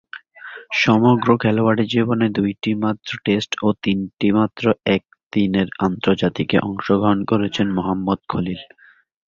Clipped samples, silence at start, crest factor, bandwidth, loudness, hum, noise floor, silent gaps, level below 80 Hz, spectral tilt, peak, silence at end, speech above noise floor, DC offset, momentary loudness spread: under 0.1%; 0.15 s; 18 dB; 7.2 kHz; -19 LUFS; none; -39 dBFS; 5.26-5.30 s; -50 dBFS; -7 dB/octave; -2 dBFS; 0.65 s; 20 dB; under 0.1%; 8 LU